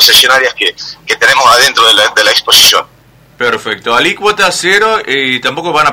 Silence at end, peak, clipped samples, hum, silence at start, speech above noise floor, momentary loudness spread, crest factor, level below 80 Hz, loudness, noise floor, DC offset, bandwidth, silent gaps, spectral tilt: 0 s; 0 dBFS; 2%; none; 0 s; 34 dB; 10 LU; 10 dB; -46 dBFS; -7 LUFS; -42 dBFS; under 0.1%; over 20 kHz; none; -0.5 dB/octave